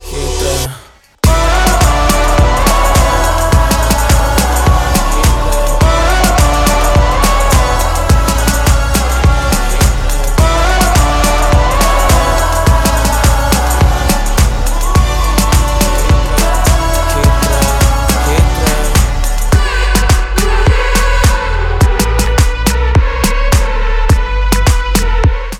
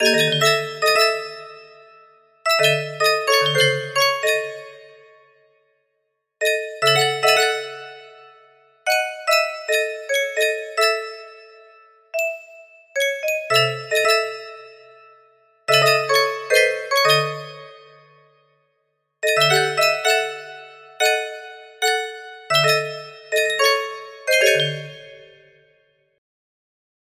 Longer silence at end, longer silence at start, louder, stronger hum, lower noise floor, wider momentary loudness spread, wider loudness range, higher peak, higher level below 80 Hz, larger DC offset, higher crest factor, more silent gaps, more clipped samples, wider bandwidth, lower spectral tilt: second, 0 s vs 1.9 s; about the same, 0 s vs 0 s; first, -11 LUFS vs -18 LUFS; neither; second, -36 dBFS vs -73 dBFS; second, 3 LU vs 18 LU; second, 1 LU vs 4 LU; about the same, 0 dBFS vs -2 dBFS; first, -12 dBFS vs -72 dBFS; neither; second, 10 dB vs 18 dB; neither; neither; about the same, 17 kHz vs 16 kHz; first, -4.5 dB/octave vs -2 dB/octave